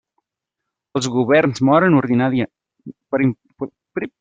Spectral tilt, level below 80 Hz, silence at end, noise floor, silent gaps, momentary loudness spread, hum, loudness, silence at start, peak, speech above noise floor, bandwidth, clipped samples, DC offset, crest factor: -6.5 dB/octave; -58 dBFS; 0.15 s; -82 dBFS; none; 14 LU; none; -18 LUFS; 0.95 s; -2 dBFS; 65 dB; 9.2 kHz; under 0.1%; under 0.1%; 16 dB